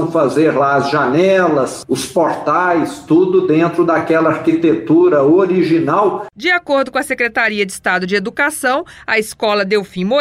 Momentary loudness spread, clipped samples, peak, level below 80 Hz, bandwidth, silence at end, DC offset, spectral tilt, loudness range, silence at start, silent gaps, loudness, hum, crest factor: 6 LU; under 0.1%; -4 dBFS; -54 dBFS; 15.5 kHz; 0 s; under 0.1%; -5.5 dB/octave; 3 LU; 0 s; none; -14 LUFS; none; 10 dB